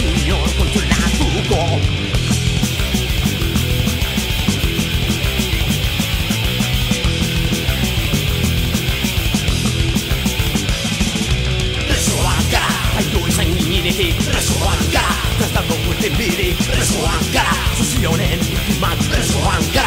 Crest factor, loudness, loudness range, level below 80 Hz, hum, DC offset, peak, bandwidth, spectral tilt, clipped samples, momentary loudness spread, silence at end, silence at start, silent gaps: 14 dB; -17 LUFS; 1 LU; -22 dBFS; none; under 0.1%; -2 dBFS; 16.5 kHz; -4 dB/octave; under 0.1%; 2 LU; 0 s; 0 s; none